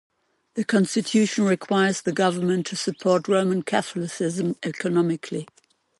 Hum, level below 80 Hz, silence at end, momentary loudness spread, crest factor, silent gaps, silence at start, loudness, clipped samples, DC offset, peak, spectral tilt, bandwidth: none; -70 dBFS; 0.55 s; 8 LU; 16 dB; none; 0.55 s; -23 LUFS; under 0.1%; under 0.1%; -6 dBFS; -5 dB/octave; 11.5 kHz